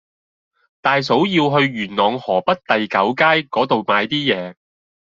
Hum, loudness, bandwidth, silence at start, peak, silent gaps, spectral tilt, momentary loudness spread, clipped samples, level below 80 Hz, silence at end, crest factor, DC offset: none; -17 LUFS; 7.6 kHz; 0.85 s; -2 dBFS; none; -6 dB/octave; 5 LU; under 0.1%; -60 dBFS; 0.65 s; 16 dB; under 0.1%